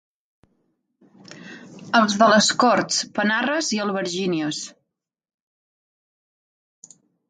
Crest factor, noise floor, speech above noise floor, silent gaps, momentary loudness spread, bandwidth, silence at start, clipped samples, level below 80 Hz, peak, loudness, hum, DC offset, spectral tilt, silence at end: 22 dB; -80 dBFS; 60 dB; none; 23 LU; 9.6 kHz; 1.3 s; under 0.1%; -70 dBFS; -2 dBFS; -20 LUFS; none; under 0.1%; -3 dB/octave; 2.6 s